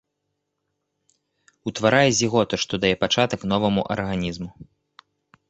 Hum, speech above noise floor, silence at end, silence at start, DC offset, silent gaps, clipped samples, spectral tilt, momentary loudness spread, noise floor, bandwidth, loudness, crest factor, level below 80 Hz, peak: none; 56 dB; 0.85 s; 1.65 s; under 0.1%; none; under 0.1%; -4 dB/octave; 14 LU; -78 dBFS; 8.2 kHz; -21 LUFS; 22 dB; -50 dBFS; -2 dBFS